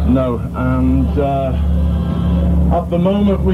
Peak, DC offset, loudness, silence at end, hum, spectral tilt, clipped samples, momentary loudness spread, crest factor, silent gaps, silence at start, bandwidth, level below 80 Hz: -4 dBFS; under 0.1%; -16 LUFS; 0 s; none; -10 dB/octave; under 0.1%; 3 LU; 10 dB; none; 0 s; 4.2 kHz; -18 dBFS